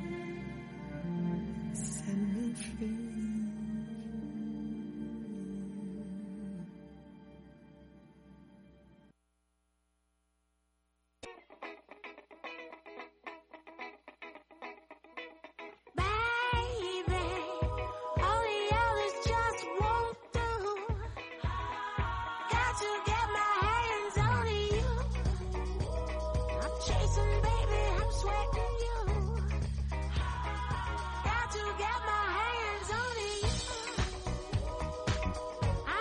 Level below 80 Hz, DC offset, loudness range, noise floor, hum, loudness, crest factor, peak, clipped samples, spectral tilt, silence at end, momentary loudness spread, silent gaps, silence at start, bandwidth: -40 dBFS; under 0.1%; 17 LU; -78 dBFS; none; -34 LUFS; 16 dB; -20 dBFS; under 0.1%; -5 dB/octave; 0 s; 18 LU; none; 0 s; 11.5 kHz